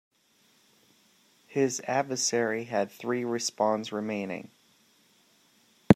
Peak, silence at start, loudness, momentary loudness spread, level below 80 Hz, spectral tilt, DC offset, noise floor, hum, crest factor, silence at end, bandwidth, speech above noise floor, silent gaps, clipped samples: -2 dBFS; 1.5 s; -30 LUFS; 9 LU; -70 dBFS; -4.5 dB/octave; under 0.1%; -66 dBFS; none; 28 dB; 0 s; 16 kHz; 37 dB; none; under 0.1%